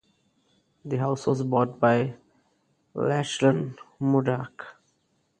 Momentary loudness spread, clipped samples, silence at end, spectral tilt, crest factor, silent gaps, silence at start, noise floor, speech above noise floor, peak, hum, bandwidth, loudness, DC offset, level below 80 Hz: 17 LU; under 0.1%; 0.7 s; -6.5 dB/octave; 20 dB; none; 0.85 s; -71 dBFS; 46 dB; -6 dBFS; none; 9.6 kHz; -25 LUFS; under 0.1%; -66 dBFS